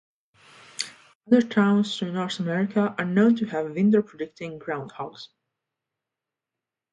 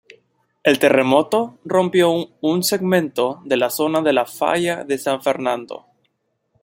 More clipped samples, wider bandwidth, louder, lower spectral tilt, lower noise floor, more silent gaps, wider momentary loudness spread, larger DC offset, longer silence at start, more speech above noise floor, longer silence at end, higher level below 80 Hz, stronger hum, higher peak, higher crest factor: neither; second, 11 kHz vs 16.5 kHz; second, -24 LUFS vs -18 LUFS; first, -6 dB/octave vs -4.5 dB/octave; first, -88 dBFS vs -70 dBFS; first, 1.15-1.21 s vs none; first, 15 LU vs 7 LU; neither; first, 0.8 s vs 0.65 s; first, 64 dB vs 52 dB; first, 1.65 s vs 0.85 s; second, -70 dBFS vs -64 dBFS; neither; second, -6 dBFS vs -2 dBFS; about the same, 20 dB vs 18 dB